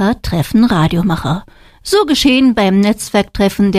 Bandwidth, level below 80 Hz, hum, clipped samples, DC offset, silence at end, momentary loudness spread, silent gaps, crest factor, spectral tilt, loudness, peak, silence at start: 15.5 kHz; -32 dBFS; none; under 0.1%; under 0.1%; 0 s; 7 LU; none; 12 dB; -5.5 dB/octave; -13 LUFS; 0 dBFS; 0 s